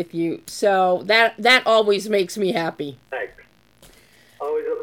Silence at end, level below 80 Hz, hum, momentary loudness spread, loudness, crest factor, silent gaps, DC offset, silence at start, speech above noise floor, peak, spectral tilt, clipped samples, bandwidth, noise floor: 0 s; -64 dBFS; none; 16 LU; -19 LUFS; 20 dB; none; under 0.1%; 0 s; 33 dB; -2 dBFS; -3.5 dB/octave; under 0.1%; 17.5 kHz; -52 dBFS